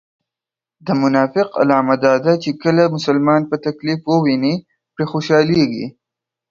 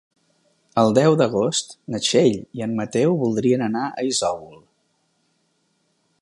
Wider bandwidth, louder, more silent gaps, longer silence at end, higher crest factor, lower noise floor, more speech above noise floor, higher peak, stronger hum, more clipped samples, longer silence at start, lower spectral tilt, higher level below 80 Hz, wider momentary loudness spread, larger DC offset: second, 7.4 kHz vs 11.5 kHz; first, -16 LUFS vs -20 LUFS; neither; second, 0.6 s vs 1.65 s; about the same, 16 dB vs 18 dB; first, -88 dBFS vs -68 dBFS; first, 72 dB vs 48 dB; first, 0 dBFS vs -4 dBFS; neither; neither; about the same, 0.85 s vs 0.75 s; first, -7 dB/octave vs -5 dB/octave; about the same, -58 dBFS vs -62 dBFS; about the same, 8 LU vs 10 LU; neither